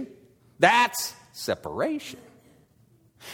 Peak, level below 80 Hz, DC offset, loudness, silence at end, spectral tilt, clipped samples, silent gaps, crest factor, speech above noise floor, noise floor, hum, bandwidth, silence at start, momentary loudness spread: -4 dBFS; -66 dBFS; under 0.1%; -25 LUFS; 0 s; -3 dB/octave; under 0.1%; none; 24 dB; 36 dB; -61 dBFS; none; 19 kHz; 0 s; 23 LU